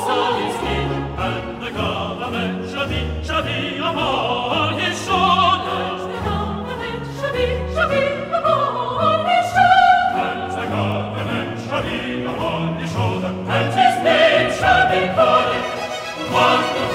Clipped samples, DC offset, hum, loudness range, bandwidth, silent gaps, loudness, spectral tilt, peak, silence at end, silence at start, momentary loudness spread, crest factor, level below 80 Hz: under 0.1%; under 0.1%; none; 6 LU; 15.5 kHz; none; -19 LUFS; -5 dB/octave; -2 dBFS; 0 s; 0 s; 10 LU; 16 dB; -40 dBFS